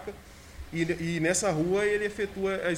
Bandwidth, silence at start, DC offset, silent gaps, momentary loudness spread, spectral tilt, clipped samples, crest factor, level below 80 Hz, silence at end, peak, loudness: 16 kHz; 0 s; under 0.1%; none; 20 LU; -4.5 dB/octave; under 0.1%; 18 dB; -50 dBFS; 0 s; -12 dBFS; -28 LUFS